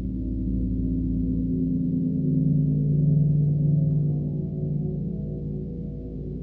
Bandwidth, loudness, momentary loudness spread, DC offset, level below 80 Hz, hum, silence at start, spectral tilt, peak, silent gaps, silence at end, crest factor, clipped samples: 0.9 kHz; -25 LUFS; 10 LU; under 0.1%; -36 dBFS; none; 0 s; -14.5 dB/octave; -12 dBFS; none; 0 s; 12 dB; under 0.1%